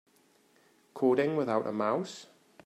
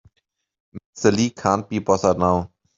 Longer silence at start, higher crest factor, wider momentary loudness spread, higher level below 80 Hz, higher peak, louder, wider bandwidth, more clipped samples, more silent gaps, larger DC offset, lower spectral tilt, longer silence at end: first, 0.95 s vs 0.75 s; about the same, 18 dB vs 20 dB; first, 18 LU vs 5 LU; second, -80 dBFS vs -54 dBFS; second, -14 dBFS vs -2 dBFS; second, -30 LUFS vs -20 LUFS; first, 12.5 kHz vs 7.8 kHz; neither; second, none vs 0.86-0.93 s; neither; about the same, -6.5 dB/octave vs -5.5 dB/octave; about the same, 0.4 s vs 0.3 s